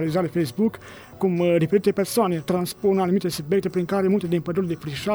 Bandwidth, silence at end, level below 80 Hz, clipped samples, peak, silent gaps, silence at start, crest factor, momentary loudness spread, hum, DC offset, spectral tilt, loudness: over 20 kHz; 0 s; -56 dBFS; under 0.1%; -8 dBFS; none; 0 s; 14 dB; 6 LU; none; under 0.1%; -6.5 dB/octave; -23 LUFS